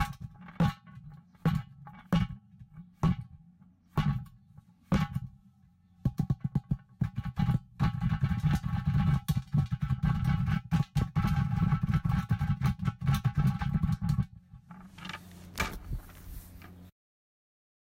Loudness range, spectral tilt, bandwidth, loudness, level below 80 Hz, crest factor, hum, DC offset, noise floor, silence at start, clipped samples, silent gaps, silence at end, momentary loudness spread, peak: 6 LU; -7.5 dB/octave; 16 kHz; -31 LUFS; -42 dBFS; 14 dB; none; under 0.1%; -62 dBFS; 0 s; under 0.1%; none; 1 s; 19 LU; -18 dBFS